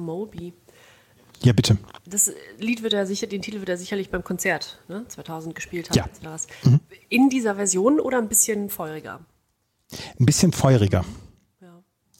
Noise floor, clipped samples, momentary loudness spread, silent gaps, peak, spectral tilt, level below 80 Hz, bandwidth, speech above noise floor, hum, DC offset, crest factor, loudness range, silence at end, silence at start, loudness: -71 dBFS; under 0.1%; 17 LU; none; -4 dBFS; -4.5 dB/octave; -48 dBFS; 17 kHz; 48 dB; none; under 0.1%; 18 dB; 6 LU; 0.95 s; 0 s; -22 LUFS